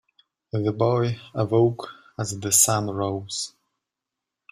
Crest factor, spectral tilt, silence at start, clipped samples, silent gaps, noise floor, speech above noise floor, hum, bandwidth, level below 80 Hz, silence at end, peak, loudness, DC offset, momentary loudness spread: 22 dB; -4.5 dB/octave; 0.55 s; under 0.1%; none; -86 dBFS; 63 dB; none; 16 kHz; -60 dBFS; 1.05 s; -4 dBFS; -23 LUFS; under 0.1%; 15 LU